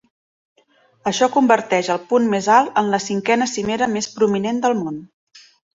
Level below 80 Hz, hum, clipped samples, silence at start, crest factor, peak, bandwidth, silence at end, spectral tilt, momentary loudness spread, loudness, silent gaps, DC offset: -60 dBFS; none; under 0.1%; 1.05 s; 18 dB; -2 dBFS; 8 kHz; 0.35 s; -4 dB/octave; 8 LU; -18 LUFS; 5.14-5.27 s; under 0.1%